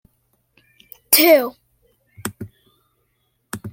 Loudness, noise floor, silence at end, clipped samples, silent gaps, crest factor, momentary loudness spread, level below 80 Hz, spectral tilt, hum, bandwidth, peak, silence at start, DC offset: -14 LUFS; -68 dBFS; 0 s; under 0.1%; none; 22 dB; 26 LU; -62 dBFS; -2.5 dB/octave; none; 16.5 kHz; 0 dBFS; 1.1 s; under 0.1%